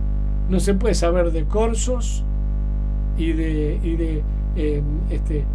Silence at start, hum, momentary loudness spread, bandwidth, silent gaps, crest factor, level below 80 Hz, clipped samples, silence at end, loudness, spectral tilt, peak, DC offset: 0 s; 50 Hz at -20 dBFS; 6 LU; 11 kHz; none; 14 dB; -22 dBFS; under 0.1%; 0 s; -22 LUFS; -6.5 dB/octave; -6 dBFS; under 0.1%